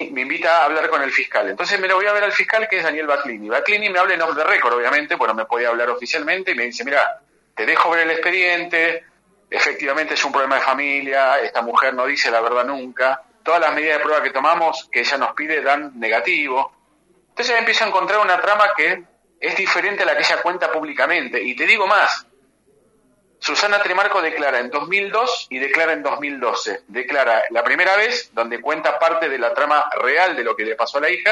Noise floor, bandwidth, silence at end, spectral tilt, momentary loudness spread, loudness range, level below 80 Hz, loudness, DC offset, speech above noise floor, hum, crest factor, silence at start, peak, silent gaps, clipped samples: -59 dBFS; 11 kHz; 0 s; -2 dB/octave; 7 LU; 2 LU; -74 dBFS; -18 LUFS; under 0.1%; 41 dB; none; 18 dB; 0 s; 0 dBFS; none; under 0.1%